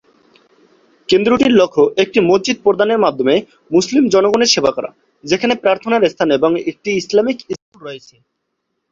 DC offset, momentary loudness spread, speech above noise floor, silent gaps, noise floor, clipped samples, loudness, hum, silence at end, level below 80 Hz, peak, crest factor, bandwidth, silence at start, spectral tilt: under 0.1%; 16 LU; 58 dB; 7.62-7.72 s; -72 dBFS; under 0.1%; -14 LUFS; none; 0.95 s; -54 dBFS; 0 dBFS; 16 dB; 7.8 kHz; 1.1 s; -4 dB/octave